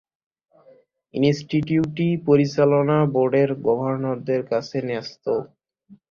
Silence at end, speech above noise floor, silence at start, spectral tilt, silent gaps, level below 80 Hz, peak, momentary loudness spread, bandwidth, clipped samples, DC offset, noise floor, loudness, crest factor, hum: 0.2 s; 34 dB; 1.15 s; -8 dB/octave; none; -60 dBFS; -4 dBFS; 8 LU; 7.2 kHz; under 0.1%; under 0.1%; -55 dBFS; -21 LUFS; 18 dB; none